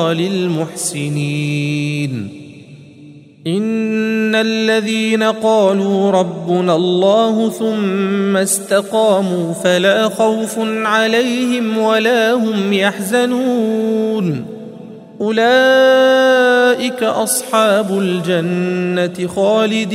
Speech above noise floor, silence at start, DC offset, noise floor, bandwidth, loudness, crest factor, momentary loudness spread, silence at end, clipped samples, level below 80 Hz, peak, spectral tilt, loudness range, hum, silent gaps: 25 dB; 0 s; under 0.1%; -39 dBFS; 16 kHz; -14 LUFS; 14 dB; 8 LU; 0 s; under 0.1%; -64 dBFS; 0 dBFS; -4.5 dB/octave; 6 LU; none; none